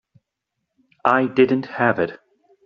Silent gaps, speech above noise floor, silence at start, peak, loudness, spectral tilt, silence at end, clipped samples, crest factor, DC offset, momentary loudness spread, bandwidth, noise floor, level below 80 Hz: none; 61 dB; 1.05 s; -2 dBFS; -19 LUFS; -4.5 dB/octave; 0.5 s; under 0.1%; 20 dB; under 0.1%; 7 LU; 6.4 kHz; -79 dBFS; -64 dBFS